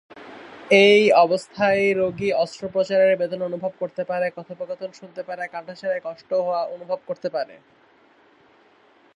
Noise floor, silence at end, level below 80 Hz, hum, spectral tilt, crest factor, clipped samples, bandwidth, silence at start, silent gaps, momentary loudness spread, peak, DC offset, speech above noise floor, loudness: -56 dBFS; 1.65 s; -66 dBFS; none; -5 dB/octave; 20 dB; under 0.1%; 11 kHz; 0.15 s; none; 19 LU; -2 dBFS; under 0.1%; 35 dB; -21 LUFS